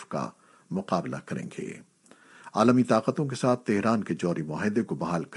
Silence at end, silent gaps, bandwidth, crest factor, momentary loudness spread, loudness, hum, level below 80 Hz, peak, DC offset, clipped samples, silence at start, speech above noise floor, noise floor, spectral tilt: 0 s; none; 11.5 kHz; 20 dB; 14 LU; -27 LUFS; none; -68 dBFS; -8 dBFS; under 0.1%; under 0.1%; 0 s; 29 dB; -56 dBFS; -6.5 dB/octave